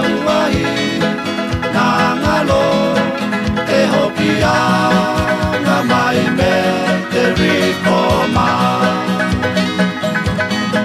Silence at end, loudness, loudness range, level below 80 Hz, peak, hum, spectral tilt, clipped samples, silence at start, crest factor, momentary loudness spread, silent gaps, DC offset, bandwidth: 0 s; -14 LUFS; 1 LU; -34 dBFS; -2 dBFS; none; -5.5 dB/octave; under 0.1%; 0 s; 14 dB; 4 LU; none; under 0.1%; 14.5 kHz